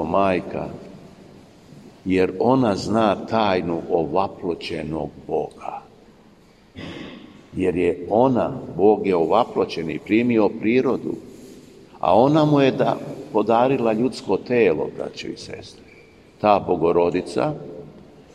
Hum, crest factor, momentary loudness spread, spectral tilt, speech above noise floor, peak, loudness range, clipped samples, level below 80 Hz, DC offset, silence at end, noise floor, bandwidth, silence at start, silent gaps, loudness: none; 18 dB; 17 LU; -7 dB/octave; 31 dB; -2 dBFS; 7 LU; under 0.1%; -54 dBFS; under 0.1%; 0.35 s; -51 dBFS; 10.5 kHz; 0 s; none; -21 LUFS